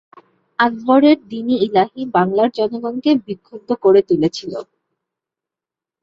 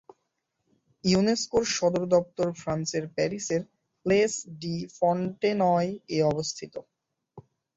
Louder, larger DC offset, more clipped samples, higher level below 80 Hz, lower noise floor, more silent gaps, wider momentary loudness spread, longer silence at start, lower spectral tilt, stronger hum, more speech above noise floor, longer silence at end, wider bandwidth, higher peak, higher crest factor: first, -16 LUFS vs -27 LUFS; neither; neither; about the same, -60 dBFS vs -60 dBFS; first, -88 dBFS vs -79 dBFS; neither; first, 16 LU vs 10 LU; second, 0.6 s vs 1.05 s; first, -6.5 dB/octave vs -5 dB/octave; neither; first, 72 dB vs 53 dB; first, 1.4 s vs 0.35 s; about the same, 7.6 kHz vs 8 kHz; first, -2 dBFS vs -10 dBFS; about the same, 16 dB vs 18 dB